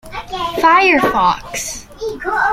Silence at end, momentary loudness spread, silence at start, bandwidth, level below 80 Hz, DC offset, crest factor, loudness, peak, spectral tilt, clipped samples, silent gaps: 0 s; 15 LU; 0.05 s; 16 kHz; -40 dBFS; under 0.1%; 14 dB; -14 LUFS; -2 dBFS; -3 dB/octave; under 0.1%; none